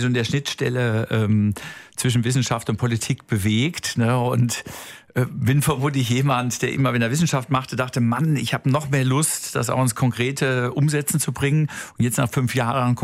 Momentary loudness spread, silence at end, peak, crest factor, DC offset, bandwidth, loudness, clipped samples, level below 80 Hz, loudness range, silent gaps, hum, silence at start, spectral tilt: 5 LU; 0 s; -6 dBFS; 14 dB; under 0.1%; 16 kHz; -21 LUFS; under 0.1%; -52 dBFS; 1 LU; none; none; 0 s; -5 dB/octave